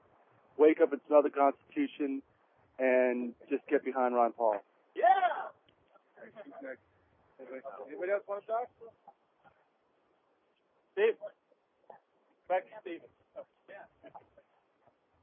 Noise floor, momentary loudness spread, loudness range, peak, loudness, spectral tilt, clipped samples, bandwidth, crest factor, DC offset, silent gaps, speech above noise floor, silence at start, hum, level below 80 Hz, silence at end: -74 dBFS; 24 LU; 12 LU; -12 dBFS; -31 LUFS; -2.5 dB/octave; under 0.1%; 3.7 kHz; 22 dB; under 0.1%; none; 42 dB; 0.6 s; none; -88 dBFS; 1.05 s